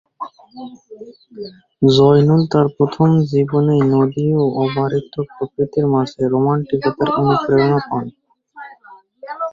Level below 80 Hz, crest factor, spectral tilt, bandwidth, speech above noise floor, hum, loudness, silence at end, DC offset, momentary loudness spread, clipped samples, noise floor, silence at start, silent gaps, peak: -52 dBFS; 16 dB; -8.5 dB/octave; 7.4 kHz; 29 dB; none; -16 LUFS; 0 s; under 0.1%; 21 LU; under 0.1%; -45 dBFS; 0.2 s; none; -2 dBFS